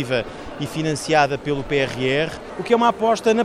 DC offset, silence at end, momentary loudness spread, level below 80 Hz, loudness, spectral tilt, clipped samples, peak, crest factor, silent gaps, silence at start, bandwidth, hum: under 0.1%; 0 s; 10 LU; -46 dBFS; -21 LUFS; -5 dB/octave; under 0.1%; -4 dBFS; 18 dB; none; 0 s; 14.5 kHz; none